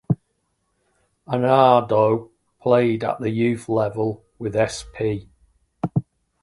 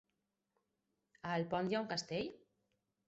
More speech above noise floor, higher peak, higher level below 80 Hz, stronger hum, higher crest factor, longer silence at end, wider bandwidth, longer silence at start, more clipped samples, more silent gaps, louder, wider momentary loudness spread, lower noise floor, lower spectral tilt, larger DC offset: first, 52 dB vs 48 dB; first, -2 dBFS vs -24 dBFS; first, -54 dBFS vs -76 dBFS; neither; about the same, 20 dB vs 18 dB; second, 0.4 s vs 0.7 s; first, 11.5 kHz vs 7.6 kHz; second, 0.1 s vs 1.25 s; neither; neither; first, -21 LUFS vs -40 LUFS; first, 12 LU vs 8 LU; second, -71 dBFS vs -87 dBFS; first, -7 dB/octave vs -4 dB/octave; neither